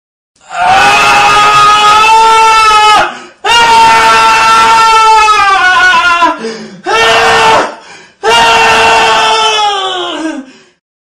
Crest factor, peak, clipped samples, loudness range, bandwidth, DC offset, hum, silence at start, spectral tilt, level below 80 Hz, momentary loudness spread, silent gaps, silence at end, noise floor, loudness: 6 dB; 0 dBFS; 0.4%; 3 LU; 15.5 kHz; under 0.1%; none; 0.5 s; -1 dB/octave; -36 dBFS; 12 LU; none; 0.65 s; -32 dBFS; -5 LUFS